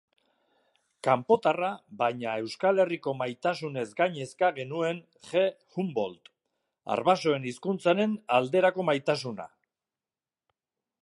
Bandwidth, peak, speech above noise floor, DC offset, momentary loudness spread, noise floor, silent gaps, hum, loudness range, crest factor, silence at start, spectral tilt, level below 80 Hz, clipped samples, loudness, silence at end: 11.5 kHz; -8 dBFS; over 62 dB; under 0.1%; 9 LU; under -90 dBFS; none; none; 3 LU; 20 dB; 1.05 s; -5.5 dB/octave; -76 dBFS; under 0.1%; -28 LUFS; 1.6 s